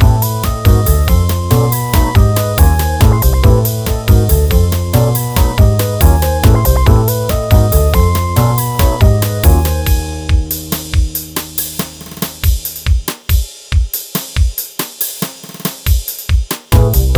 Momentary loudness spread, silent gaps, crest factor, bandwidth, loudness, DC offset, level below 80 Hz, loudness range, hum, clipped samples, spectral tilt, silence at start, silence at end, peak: 7 LU; none; 12 dB; over 20 kHz; -13 LUFS; under 0.1%; -14 dBFS; 6 LU; none; 0.3%; -5.5 dB/octave; 0 s; 0 s; 0 dBFS